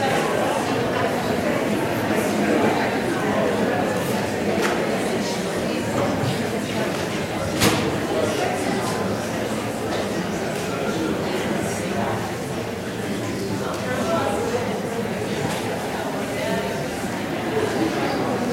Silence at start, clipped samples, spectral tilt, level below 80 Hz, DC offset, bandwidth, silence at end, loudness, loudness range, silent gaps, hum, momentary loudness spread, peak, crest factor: 0 s; under 0.1%; -5 dB/octave; -48 dBFS; under 0.1%; 16 kHz; 0 s; -23 LUFS; 4 LU; none; none; 5 LU; -6 dBFS; 18 dB